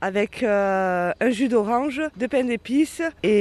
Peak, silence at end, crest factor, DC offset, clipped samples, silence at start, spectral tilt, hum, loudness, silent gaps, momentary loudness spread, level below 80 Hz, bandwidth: -8 dBFS; 0 s; 14 dB; under 0.1%; under 0.1%; 0 s; -5.5 dB/octave; none; -22 LUFS; none; 4 LU; -56 dBFS; 13.5 kHz